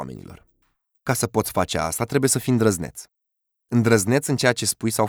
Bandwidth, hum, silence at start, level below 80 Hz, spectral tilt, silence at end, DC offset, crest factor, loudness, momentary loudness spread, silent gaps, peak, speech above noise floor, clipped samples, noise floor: over 20 kHz; none; 0 s; -52 dBFS; -4.5 dB/octave; 0 s; under 0.1%; 18 dB; -21 LUFS; 15 LU; none; -4 dBFS; 58 dB; under 0.1%; -79 dBFS